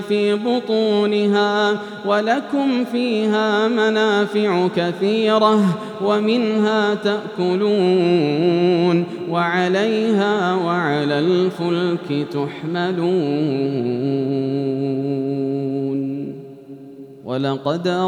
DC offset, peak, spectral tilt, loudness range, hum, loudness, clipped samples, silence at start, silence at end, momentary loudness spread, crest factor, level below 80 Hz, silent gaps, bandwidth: under 0.1%; -4 dBFS; -6.5 dB/octave; 5 LU; none; -19 LUFS; under 0.1%; 0 s; 0 s; 7 LU; 14 dB; -78 dBFS; none; 11 kHz